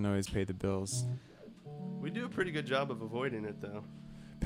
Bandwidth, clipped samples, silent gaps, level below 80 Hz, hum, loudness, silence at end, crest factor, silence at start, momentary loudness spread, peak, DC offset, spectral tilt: 16 kHz; under 0.1%; none; -58 dBFS; none; -37 LUFS; 0 s; 18 dB; 0 s; 17 LU; -18 dBFS; under 0.1%; -5.5 dB/octave